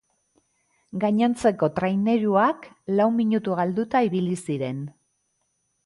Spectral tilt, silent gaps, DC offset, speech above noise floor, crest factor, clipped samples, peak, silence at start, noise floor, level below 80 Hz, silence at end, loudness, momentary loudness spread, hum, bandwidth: -7 dB/octave; none; under 0.1%; 51 dB; 16 dB; under 0.1%; -8 dBFS; 0.95 s; -73 dBFS; -64 dBFS; 0.95 s; -23 LUFS; 10 LU; none; 11.5 kHz